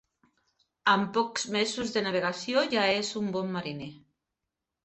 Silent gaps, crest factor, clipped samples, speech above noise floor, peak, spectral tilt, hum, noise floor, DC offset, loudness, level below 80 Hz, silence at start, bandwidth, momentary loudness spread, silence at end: none; 22 dB; under 0.1%; 58 dB; -8 dBFS; -3.5 dB/octave; none; -87 dBFS; under 0.1%; -28 LUFS; -68 dBFS; 0.85 s; 8.6 kHz; 9 LU; 0.85 s